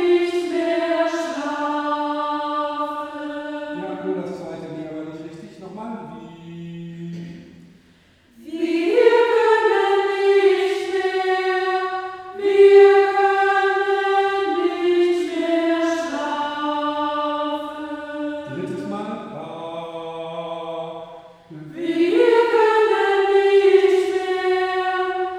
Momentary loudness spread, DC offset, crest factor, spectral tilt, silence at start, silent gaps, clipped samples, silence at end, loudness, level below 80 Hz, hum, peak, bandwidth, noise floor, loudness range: 18 LU; under 0.1%; 18 dB; -5 dB/octave; 0 s; none; under 0.1%; 0 s; -19 LUFS; -66 dBFS; none; -2 dBFS; 10 kHz; -54 dBFS; 15 LU